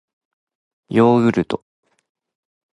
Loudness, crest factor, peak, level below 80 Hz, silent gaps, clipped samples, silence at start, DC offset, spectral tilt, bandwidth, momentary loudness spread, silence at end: -17 LUFS; 18 dB; -2 dBFS; -56 dBFS; none; under 0.1%; 0.9 s; under 0.1%; -8 dB/octave; 10.5 kHz; 12 LU; 1.2 s